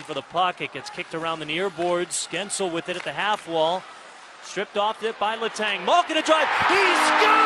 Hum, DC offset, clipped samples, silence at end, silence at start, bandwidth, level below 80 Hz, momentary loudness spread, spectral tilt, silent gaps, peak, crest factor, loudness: none; under 0.1%; under 0.1%; 0 s; 0 s; 12.5 kHz; -66 dBFS; 14 LU; -2.5 dB/octave; none; -6 dBFS; 18 dB; -23 LUFS